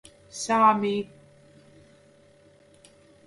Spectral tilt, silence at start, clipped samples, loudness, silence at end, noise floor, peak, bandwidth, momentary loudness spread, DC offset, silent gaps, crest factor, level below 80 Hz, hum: -4.5 dB/octave; 0.35 s; under 0.1%; -23 LUFS; 2.2 s; -57 dBFS; -8 dBFS; 11.5 kHz; 22 LU; under 0.1%; none; 22 dB; -70 dBFS; none